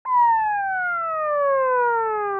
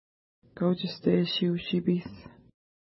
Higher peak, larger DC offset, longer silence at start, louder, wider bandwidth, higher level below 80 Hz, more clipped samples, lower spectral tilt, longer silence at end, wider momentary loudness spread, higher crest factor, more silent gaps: about the same, -12 dBFS vs -12 dBFS; neither; second, 0.05 s vs 0.55 s; first, -21 LUFS vs -28 LUFS; second, 3.6 kHz vs 5.8 kHz; about the same, -64 dBFS vs -64 dBFS; neither; second, -7 dB/octave vs -10.5 dB/octave; second, 0 s vs 0.55 s; second, 5 LU vs 9 LU; second, 10 dB vs 18 dB; neither